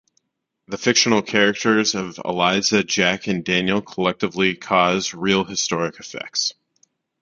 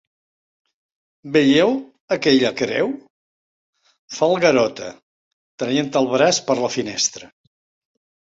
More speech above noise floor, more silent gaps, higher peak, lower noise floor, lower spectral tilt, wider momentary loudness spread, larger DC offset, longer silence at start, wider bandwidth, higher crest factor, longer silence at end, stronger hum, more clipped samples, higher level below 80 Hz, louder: second, 56 dB vs over 72 dB; second, none vs 2.00-2.08 s, 3.10-3.73 s, 3.99-4.08 s, 5.03-5.58 s; about the same, 0 dBFS vs -2 dBFS; second, -76 dBFS vs under -90 dBFS; about the same, -3 dB/octave vs -3.5 dB/octave; second, 9 LU vs 14 LU; neither; second, 0.7 s vs 1.25 s; about the same, 7.6 kHz vs 8 kHz; about the same, 20 dB vs 20 dB; second, 0.7 s vs 1 s; neither; neither; first, -56 dBFS vs -62 dBFS; about the same, -19 LUFS vs -19 LUFS